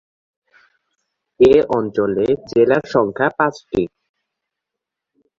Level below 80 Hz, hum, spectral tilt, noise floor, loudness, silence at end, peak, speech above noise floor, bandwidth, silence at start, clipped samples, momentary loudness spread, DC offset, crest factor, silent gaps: -48 dBFS; none; -7 dB/octave; -83 dBFS; -17 LUFS; 1.5 s; -2 dBFS; 67 dB; 7.4 kHz; 1.4 s; under 0.1%; 10 LU; under 0.1%; 18 dB; none